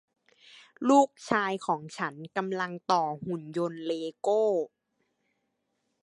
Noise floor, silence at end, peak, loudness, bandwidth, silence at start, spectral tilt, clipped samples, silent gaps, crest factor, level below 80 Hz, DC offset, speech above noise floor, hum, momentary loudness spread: -79 dBFS; 1.35 s; -8 dBFS; -29 LUFS; 11 kHz; 0.8 s; -5 dB/octave; under 0.1%; none; 22 dB; -76 dBFS; under 0.1%; 50 dB; none; 11 LU